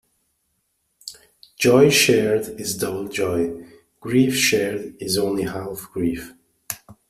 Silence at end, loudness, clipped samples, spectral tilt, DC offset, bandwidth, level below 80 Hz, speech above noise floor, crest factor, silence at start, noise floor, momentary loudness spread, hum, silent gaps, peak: 0.15 s; -20 LUFS; under 0.1%; -4 dB/octave; under 0.1%; 16 kHz; -54 dBFS; 51 dB; 20 dB; 1.05 s; -71 dBFS; 23 LU; none; none; -2 dBFS